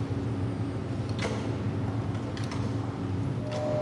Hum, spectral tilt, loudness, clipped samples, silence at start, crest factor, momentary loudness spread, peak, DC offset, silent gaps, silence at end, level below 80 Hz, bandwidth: none; -7.5 dB/octave; -32 LUFS; under 0.1%; 0 s; 14 dB; 2 LU; -16 dBFS; under 0.1%; none; 0 s; -50 dBFS; 11.5 kHz